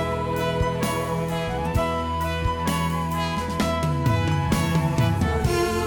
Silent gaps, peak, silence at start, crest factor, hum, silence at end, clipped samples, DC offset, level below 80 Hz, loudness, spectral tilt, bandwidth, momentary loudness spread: none; -12 dBFS; 0 s; 12 dB; none; 0 s; under 0.1%; under 0.1%; -34 dBFS; -24 LUFS; -6 dB/octave; over 20 kHz; 4 LU